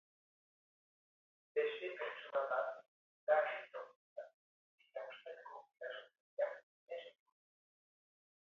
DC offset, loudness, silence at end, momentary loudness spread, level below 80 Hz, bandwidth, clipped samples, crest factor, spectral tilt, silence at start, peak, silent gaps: under 0.1%; -42 LUFS; 1.4 s; 19 LU; under -90 dBFS; 6.6 kHz; under 0.1%; 24 dB; 1 dB/octave; 1.55 s; -22 dBFS; 2.88-3.27 s, 3.96-4.16 s, 4.34-4.78 s, 6.20-6.37 s, 6.63-6.87 s